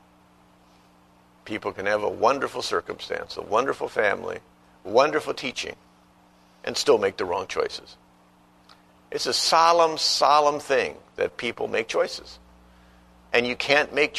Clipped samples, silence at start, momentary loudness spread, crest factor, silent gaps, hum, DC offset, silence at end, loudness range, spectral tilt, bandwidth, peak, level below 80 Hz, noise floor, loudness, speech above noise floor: under 0.1%; 1.45 s; 14 LU; 22 dB; none; 60 Hz at -60 dBFS; under 0.1%; 0 s; 6 LU; -2.5 dB/octave; 13.5 kHz; -4 dBFS; -60 dBFS; -57 dBFS; -23 LUFS; 33 dB